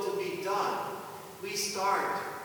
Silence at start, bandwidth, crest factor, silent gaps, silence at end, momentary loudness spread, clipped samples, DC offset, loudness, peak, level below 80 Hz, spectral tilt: 0 s; over 20 kHz; 16 dB; none; 0 s; 12 LU; under 0.1%; under 0.1%; -32 LUFS; -16 dBFS; -76 dBFS; -2.5 dB/octave